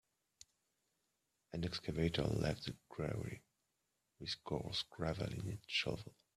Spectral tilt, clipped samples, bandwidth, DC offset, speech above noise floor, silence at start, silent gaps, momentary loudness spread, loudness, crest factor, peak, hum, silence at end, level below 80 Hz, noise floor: -5.5 dB/octave; under 0.1%; 14 kHz; under 0.1%; 44 dB; 1.5 s; none; 11 LU; -42 LUFS; 20 dB; -22 dBFS; none; 0.25 s; -60 dBFS; -86 dBFS